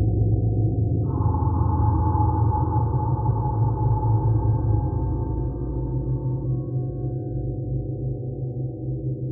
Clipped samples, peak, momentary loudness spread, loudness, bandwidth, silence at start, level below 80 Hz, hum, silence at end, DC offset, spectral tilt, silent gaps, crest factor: under 0.1%; -8 dBFS; 8 LU; -24 LUFS; 1.7 kHz; 0 s; -32 dBFS; none; 0 s; under 0.1%; -7 dB/octave; none; 14 dB